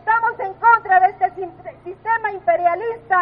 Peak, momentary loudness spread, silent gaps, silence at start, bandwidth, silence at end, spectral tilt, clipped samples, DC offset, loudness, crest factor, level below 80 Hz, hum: -2 dBFS; 17 LU; none; 0.05 s; 4.4 kHz; 0 s; -8 dB/octave; under 0.1%; under 0.1%; -18 LUFS; 16 dB; -58 dBFS; none